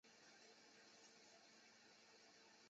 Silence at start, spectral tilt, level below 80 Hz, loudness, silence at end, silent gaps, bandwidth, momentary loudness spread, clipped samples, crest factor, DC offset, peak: 0.05 s; -0.5 dB/octave; under -90 dBFS; -67 LUFS; 0 s; none; 7.6 kHz; 1 LU; under 0.1%; 14 dB; under 0.1%; -56 dBFS